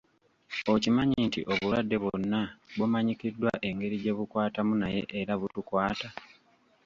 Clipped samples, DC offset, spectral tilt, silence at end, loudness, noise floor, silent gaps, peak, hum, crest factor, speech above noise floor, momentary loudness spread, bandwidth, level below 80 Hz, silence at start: under 0.1%; under 0.1%; -6.5 dB/octave; 0.6 s; -30 LUFS; -65 dBFS; none; -12 dBFS; none; 18 dB; 36 dB; 7 LU; 7.4 kHz; -58 dBFS; 0.5 s